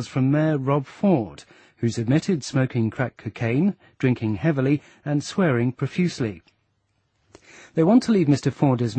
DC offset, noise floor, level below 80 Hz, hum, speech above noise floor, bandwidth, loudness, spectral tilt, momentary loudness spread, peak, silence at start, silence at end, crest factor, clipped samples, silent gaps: under 0.1%; -70 dBFS; -58 dBFS; none; 48 dB; 8.8 kHz; -23 LUFS; -7.5 dB/octave; 9 LU; -6 dBFS; 0 s; 0 s; 16 dB; under 0.1%; none